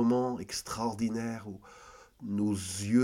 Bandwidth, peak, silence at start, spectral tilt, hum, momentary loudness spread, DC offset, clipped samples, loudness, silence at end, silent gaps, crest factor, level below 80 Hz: 16 kHz; -14 dBFS; 0 s; -5.5 dB/octave; none; 20 LU; under 0.1%; under 0.1%; -33 LUFS; 0 s; none; 18 dB; -62 dBFS